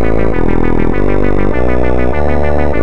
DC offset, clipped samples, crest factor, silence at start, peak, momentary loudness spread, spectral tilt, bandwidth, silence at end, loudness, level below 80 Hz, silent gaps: 30%; under 0.1%; 14 dB; 0 s; -2 dBFS; 1 LU; -9.5 dB/octave; 7 kHz; 0 s; -14 LUFS; -18 dBFS; none